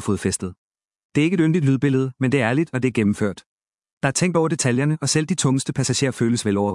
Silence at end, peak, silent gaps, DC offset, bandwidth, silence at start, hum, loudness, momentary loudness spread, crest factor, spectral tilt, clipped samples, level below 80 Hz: 0 s; -2 dBFS; 0.58-0.71 s, 1.04-1.10 s, 3.46-3.58 s, 3.92-4.01 s; under 0.1%; 12 kHz; 0 s; none; -21 LUFS; 7 LU; 18 dB; -5 dB/octave; under 0.1%; -58 dBFS